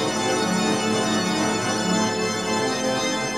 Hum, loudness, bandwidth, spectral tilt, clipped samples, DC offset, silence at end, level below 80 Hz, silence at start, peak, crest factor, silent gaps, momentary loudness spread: none; -22 LUFS; 16 kHz; -3.5 dB/octave; under 0.1%; 0.2%; 0 s; -56 dBFS; 0 s; -10 dBFS; 14 dB; none; 2 LU